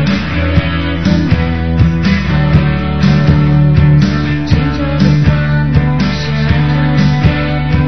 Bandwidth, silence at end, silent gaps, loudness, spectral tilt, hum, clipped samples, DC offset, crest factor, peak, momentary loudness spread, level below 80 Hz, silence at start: 6.2 kHz; 0 s; none; -11 LUFS; -8 dB/octave; none; 0.2%; 4%; 10 dB; 0 dBFS; 5 LU; -20 dBFS; 0 s